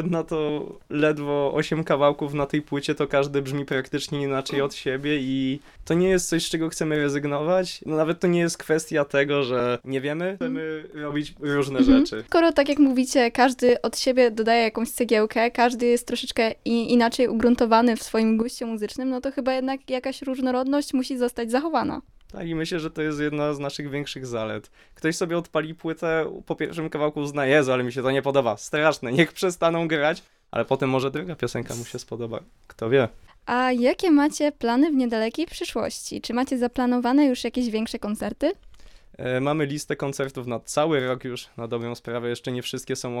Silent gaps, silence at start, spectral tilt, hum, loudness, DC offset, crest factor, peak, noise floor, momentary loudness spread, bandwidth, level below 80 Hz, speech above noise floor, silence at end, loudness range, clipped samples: none; 0 s; -5 dB/octave; none; -24 LUFS; under 0.1%; 18 dB; -4 dBFS; -46 dBFS; 11 LU; 15.5 kHz; -50 dBFS; 23 dB; 0 s; 7 LU; under 0.1%